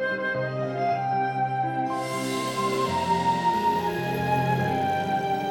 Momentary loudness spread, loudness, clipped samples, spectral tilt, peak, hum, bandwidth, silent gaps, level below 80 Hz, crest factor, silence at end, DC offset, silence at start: 4 LU; -26 LUFS; under 0.1%; -5.5 dB/octave; -12 dBFS; none; 17 kHz; none; -58 dBFS; 14 dB; 0 s; under 0.1%; 0 s